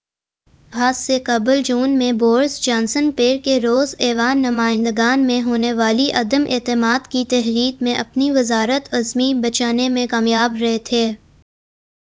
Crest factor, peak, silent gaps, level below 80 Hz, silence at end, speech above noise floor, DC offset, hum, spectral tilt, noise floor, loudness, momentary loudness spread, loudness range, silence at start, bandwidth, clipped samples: 18 dB; 0 dBFS; none; -52 dBFS; 0.85 s; 47 dB; under 0.1%; none; -3 dB/octave; -63 dBFS; -17 LUFS; 4 LU; 1 LU; 0.7 s; 8 kHz; under 0.1%